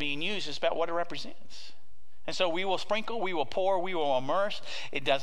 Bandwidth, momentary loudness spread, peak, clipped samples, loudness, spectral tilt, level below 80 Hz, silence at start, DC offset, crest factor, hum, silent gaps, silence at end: 12 kHz; 16 LU; -12 dBFS; under 0.1%; -31 LUFS; -4 dB/octave; -66 dBFS; 0 s; 3%; 20 dB; none; none; 0 s